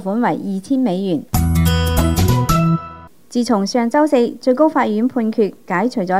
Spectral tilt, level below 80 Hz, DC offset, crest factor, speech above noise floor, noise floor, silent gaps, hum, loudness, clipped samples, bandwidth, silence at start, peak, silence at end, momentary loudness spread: -6.5 dB/octave; -32 dBFS; 0.5%; 14 dB; 20 dB; -36 dBFS; none; none; -17 LUFS; under 0.1%; 16 kHz; 0 s; -2 dBFS; 0 s; 6 LU